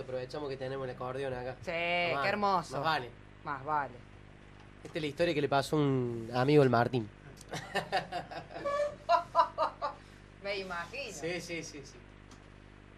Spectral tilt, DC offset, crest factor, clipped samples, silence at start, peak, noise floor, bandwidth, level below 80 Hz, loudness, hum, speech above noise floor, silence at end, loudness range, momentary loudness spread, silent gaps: -5.5 dB/octave; under 0.1%; 20 dB; under 0.1%; 0 s; -12 dBFS; -54 dBFS; 13 kHz; -60 dBFS; -33 LUFS; 50 Hz at -55 dBFS; 21 dB; 0.6 s; 4 LU; 15 LU; none